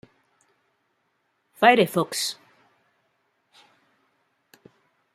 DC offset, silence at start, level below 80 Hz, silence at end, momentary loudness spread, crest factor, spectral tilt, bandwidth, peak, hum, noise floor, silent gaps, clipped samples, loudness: under 0.1%; 1.6 s; -76 dBFS; 2.8 s; 12 LU; 26 dB; -3.5 dB/octave; 15.5 kHz; -2 dBFS; none; -72 dBFS; none; under 0.1%; -21 LUFS